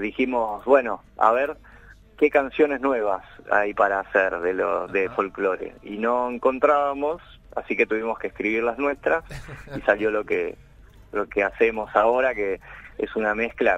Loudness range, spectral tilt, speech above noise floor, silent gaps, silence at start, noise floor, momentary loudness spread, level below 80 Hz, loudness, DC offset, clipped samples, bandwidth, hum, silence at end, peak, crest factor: 3 LU; -6.5 dB/octave; 25 dB; none; 0 s; -48 dBFS; 12 LU; -50 dBFS; -23 LUFS; under 0.1%; under 0.1%; 9 kHz; none; 0 s; -4 dBFS; 20 dB